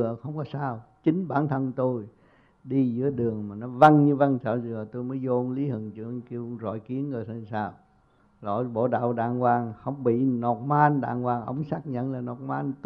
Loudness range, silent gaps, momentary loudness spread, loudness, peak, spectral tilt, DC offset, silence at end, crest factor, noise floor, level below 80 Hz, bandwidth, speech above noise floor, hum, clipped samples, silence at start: 8 LU; none; 12 LU; -26 LUFS; -2 dBFS; -10 dB/octave; under 0.1%; 0.1 s; 24 dB; -62 dBFS; -66 dBFS; 6.4 kHz; 36 dB; none; under 0.1%; 0 s